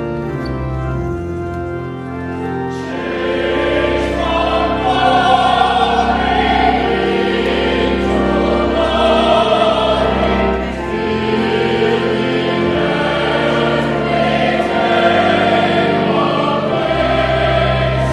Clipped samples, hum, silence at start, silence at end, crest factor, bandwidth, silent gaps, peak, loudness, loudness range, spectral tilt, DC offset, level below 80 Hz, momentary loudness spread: under 0.1%; none; 0 s; 0 s; 14 dB; 11.5 kHz; none; 0 dBFS; -15 LUFS; 5 LU; -6 dB/octave; under 0.1%; -30 dBFS; 9 LU